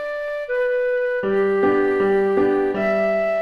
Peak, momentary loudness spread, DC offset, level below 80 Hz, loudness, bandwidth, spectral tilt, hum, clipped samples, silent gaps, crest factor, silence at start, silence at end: -8 dBFS; 5 LU; under 0.1%; -52 dBFS; -20 LUFS; 5.6 kHz; -7.5 dB/octave; none; under 0.1%; none; 12 dB; 0 s; 0 s